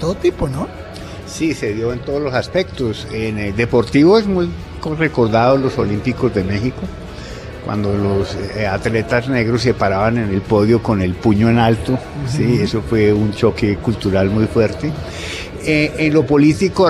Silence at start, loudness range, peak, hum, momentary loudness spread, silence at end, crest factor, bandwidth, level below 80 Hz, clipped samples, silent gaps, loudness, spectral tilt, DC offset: 0 s; 5 LU; -2 dBFS; none; 12 LU; 0 s; 14 dB; 12.5 kHz; -36 dBFS; under 0.1%; none; -16 LUFS; -7 dB/octave; under 0.1%